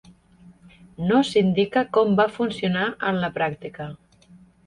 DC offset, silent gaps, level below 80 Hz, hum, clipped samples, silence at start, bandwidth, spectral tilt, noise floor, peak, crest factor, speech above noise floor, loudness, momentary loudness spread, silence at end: under 0.1%; none; -58 dBFS; none; under 0.1%; 0.5 s; 11 kHz; -6.5 dB/octave; -52 dBFS; -6 dBFS; 16 dB; 30 dB; -22 LUFS; 15 LU; 0.7 s